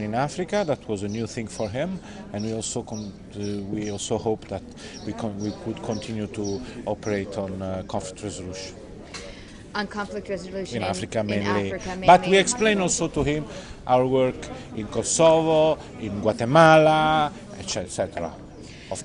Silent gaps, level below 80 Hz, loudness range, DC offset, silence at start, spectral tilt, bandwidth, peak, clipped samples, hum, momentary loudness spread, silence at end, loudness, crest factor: none; -48 dBFS; 12 LU; under 0.1%; 0 s; -4.5 dB/octave; 11 kHz; -2 dBFS; under 0.1%; none; 18 LU; 0 s; -24 LUFS; 22 dB